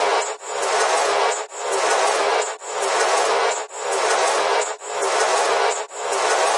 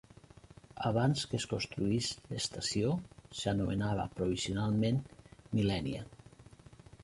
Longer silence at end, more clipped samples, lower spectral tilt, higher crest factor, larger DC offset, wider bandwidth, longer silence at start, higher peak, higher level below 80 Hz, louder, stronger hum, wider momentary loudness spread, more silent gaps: about the same, 0 s vs 0 s; neither; second, 1 dB/octave vs -5.5 dB/octave; about the same, 14 dB vs 18 dB; neither; about the same, 11.5 kHz vs 11.5 kHz; second, 0 s vs 0.75 s; first, -6 dBFS vs -18 dBFS; second, under -90 dBFS vs -56 dBFS; first, -20 LUFS vs -34 LUFS; neither; about the same, 7 LU vs 9 LU; neither